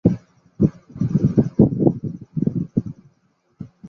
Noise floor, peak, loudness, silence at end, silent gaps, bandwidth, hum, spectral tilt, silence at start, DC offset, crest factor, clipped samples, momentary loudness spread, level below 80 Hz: -64 dBFS; -2 dBFS; -21 LUFS; 0 s; none; 6.4 kHz; none; -11.5 dB/octave; 0.05 s; under 0.1%; 20 dB; under 0.1%; 15 LU; -42 dBFS